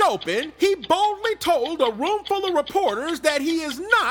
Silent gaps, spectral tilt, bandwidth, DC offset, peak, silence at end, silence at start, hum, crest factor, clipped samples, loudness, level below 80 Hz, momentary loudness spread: none; -2.5 dB/octave; 19 kHz; under 0.1%; -4 dBFS; 0 s; 0 s; none; 18 dB; under 0.1%; -22 LUFS; -56 dBFS; 5 LU